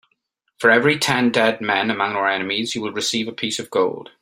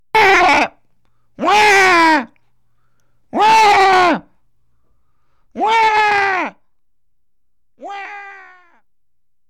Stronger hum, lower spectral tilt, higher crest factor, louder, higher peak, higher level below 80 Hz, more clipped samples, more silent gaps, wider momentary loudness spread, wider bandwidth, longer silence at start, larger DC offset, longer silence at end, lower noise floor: neither; about the same, -3.5 dB/octave vs -2.5 dB/octave; first, 18 dB vs 12 dB; second, -19 LUFS vs -12 LUFS; about the same, -2 dBFS vs -4 dBFS; second, -64 dBFS vs -52 dBFS; neither; neither; second, 8 LU vs 20 LU; second, 16 kHz vs 18.5 kHz; first, 0.6 s vs 0.15 s; neither; second, 0.15 s vs 1.15 s; second, -70 dBFS vs -78 dBFS